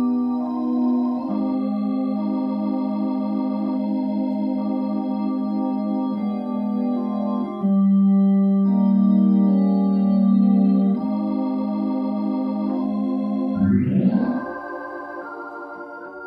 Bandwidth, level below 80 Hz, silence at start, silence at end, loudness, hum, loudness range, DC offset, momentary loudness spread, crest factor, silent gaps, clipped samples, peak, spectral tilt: 5 kHz; -60 dBFS; 0 s; 0 s; -21 LUFS; none; 6 LU; under 0.1%; 9 LU; 14 dB; none; under 0.1%; -8 dBFS; -11.5 dB/octave